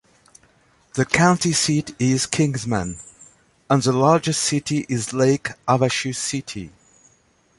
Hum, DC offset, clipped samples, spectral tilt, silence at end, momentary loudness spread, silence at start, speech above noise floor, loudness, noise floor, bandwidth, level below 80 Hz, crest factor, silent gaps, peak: none; under 0.1%; under 0.1%; -4.5 dB/octave; 0.9 s; 13 LU; 0.95 s; 40 dB; -20 LUFS; -60 dBFS; 11.5 kHz; -52 dBFS; 20 dB; none; 0 dBFS